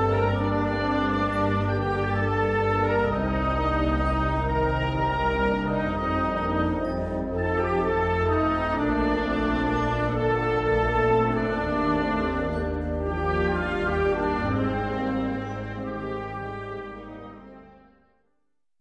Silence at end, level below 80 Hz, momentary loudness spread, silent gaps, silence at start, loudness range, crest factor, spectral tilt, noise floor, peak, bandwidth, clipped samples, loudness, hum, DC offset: 1.1 s; -36 dBFS; 9 LU; none; 0 s; 5 LU; 16 dB; -8 dB/octave; -80 dBFS; -10 dBFS; 10 kHz; under 0.1%; -25 LUFS; none; under 0.1%